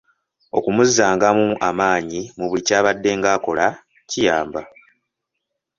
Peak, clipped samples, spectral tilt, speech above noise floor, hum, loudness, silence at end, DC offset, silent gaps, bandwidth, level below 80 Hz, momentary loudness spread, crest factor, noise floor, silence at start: -2 dBFS; under 0.1%; -3.5 dB/octave; 61 dB; none; -18 LUFS; 1.1 s; under 0.1%; none; 7.6 kHz; -54 dBFS; 11 LU; 18 dB; -79 dBFS; 0.55 s